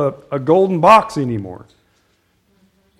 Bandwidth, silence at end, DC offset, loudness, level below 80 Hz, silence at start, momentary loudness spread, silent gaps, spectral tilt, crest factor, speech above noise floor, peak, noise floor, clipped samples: 15.5 kHz; 1.45 s; under 0.1%; -14 LUFS; -54 dBFS; 0 s; 15 LU; none; -6.5 dB/octave; 18 dB; 46 dB; 0 dBFS; -61 dBFS; 0.1%